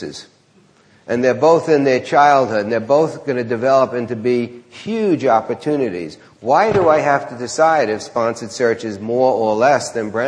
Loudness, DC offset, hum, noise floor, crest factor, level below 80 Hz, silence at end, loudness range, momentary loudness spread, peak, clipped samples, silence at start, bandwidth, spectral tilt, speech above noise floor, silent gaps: -16 LUFS; under 0.1%; none; -52 dBFS; 16 dB; -58 dBFS; 0 s; 3 LU; 11 LU; 0 dBFS; under 0.1%; 0 s; 10.5 kHz; -5.5 dB/octave; 36 dB; none